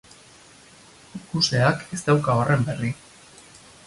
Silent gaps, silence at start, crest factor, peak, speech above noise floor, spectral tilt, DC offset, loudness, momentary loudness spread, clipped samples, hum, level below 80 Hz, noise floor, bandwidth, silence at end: none; 1.15 s; 18 dB; -6 dBFS; 28 dB; -5 dB/octave; under 0.1%; -22 LUFS; 18 LU; under 0.1%; none; -54 dBFS; -50 dBFS; 11.5 kHz; 0.95 s